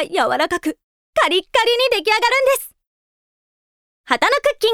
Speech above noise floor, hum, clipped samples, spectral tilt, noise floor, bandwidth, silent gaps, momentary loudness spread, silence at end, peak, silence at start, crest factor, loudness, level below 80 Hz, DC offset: over 73 dB; none; under 0.1%; -1 dB/octave; under -90 dBFS; 18.5 kHz; 0.83-1.13 s, 2.87-4.04 s; 8 LU; 0 s; 0 dBFS; 0 s; 18 dB; -17 LUFS; -54 dBFS; under 0.1%